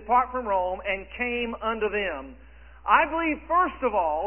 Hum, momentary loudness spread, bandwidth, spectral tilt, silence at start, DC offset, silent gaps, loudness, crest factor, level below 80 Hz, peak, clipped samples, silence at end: none; 9 LU; 3.3 kHz; -8 dB/octave; 0 s; 0.2%; none; -25 LUFS; 20 dB; -48 dBFS; -6 dBFS; under 0.1%; 0 s